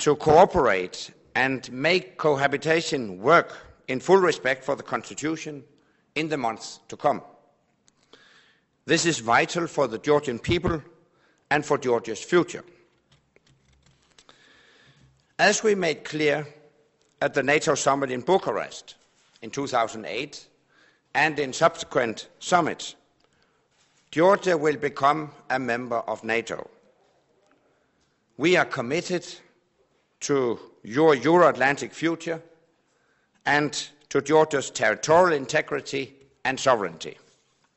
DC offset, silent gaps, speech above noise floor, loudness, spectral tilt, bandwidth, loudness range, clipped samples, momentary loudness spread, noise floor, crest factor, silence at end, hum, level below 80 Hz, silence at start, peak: under 0.1%; none; 45 dB; -24 LUFS; -4 dB/octave; 8.2 kHz; 6 LU; under 0.1%; 15 LU; -68 dBFS; 22 dB; 0.65 s; none; -56 dBFS; 0 s; -4 dBFS